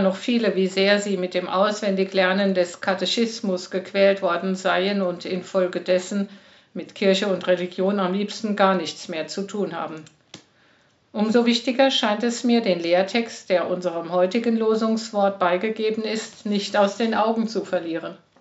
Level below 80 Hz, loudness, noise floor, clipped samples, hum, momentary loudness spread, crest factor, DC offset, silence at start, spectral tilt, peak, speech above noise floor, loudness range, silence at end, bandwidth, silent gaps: -78 dBFS; -22 LUFS; -60 dBFS; under 0.1%; none; 9 LU; 20 dB; under 0.1%; 0 s; -3.5 dB/octave; -2 dBFS; 38 dB; 3 LU; 0.25 s; 8 kHz; none